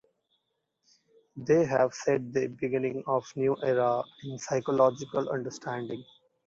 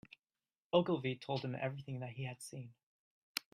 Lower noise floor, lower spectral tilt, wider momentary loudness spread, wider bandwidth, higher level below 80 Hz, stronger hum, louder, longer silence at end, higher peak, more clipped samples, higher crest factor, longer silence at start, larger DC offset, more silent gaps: second, -79 dBFS vs under -90 dBFS; about the same, -6 dB/octave vs -5.5 dB/octave; about the same, 14 LU vs 15 LU; second, 7.8 kHz vs 15 kHz; first, -70 dBFS vs -78 dBFS; neither; first, -29 LUFS vs -40 LUFS; first, 0.45 s vs 0.15 s; first, -10 dBFS vs -16 dBFS; neither; about the same, 20 dB vs 24 dB; first, 1.35 s vs 0.75 s; neither; second, none vs 2.83-3.35 s